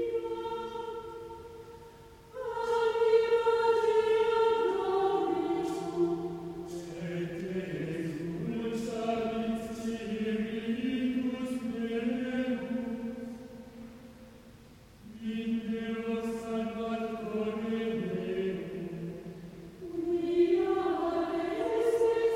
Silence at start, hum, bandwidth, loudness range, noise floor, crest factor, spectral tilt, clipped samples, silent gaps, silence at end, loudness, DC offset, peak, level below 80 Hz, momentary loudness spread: 0 s; none; 14.5 kHz; 9 LU; -54 dBFS; 18 dB; -6.5 dB/octave; under 0.1%; none; 0 s; -32 LUFS; under 0.1%; -14 dBFS; -60 dBFS; 18 LU